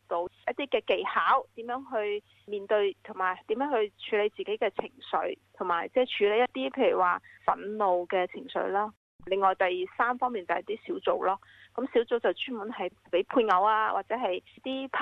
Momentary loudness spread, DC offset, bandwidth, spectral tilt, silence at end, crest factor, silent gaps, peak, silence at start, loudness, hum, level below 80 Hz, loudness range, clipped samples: 11 LU; under 0.1%; 6.4 kHz; -6 dB/octave; 0 s; 18 dB; 8.97-9.19 s; -10 dBFS; 0.1 s; -29 LUFS; none; -70 dBFS; 3 LU; under 0.1%